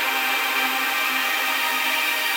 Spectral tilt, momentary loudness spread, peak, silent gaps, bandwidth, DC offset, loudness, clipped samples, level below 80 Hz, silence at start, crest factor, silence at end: 2 dB/octave; 1 LU; -10 dBFS; none; 19.5 kHz; under 0.1%; -20 LUFS; under 0.1%; -88 dBFS; 0 s; 12 dB; 0 s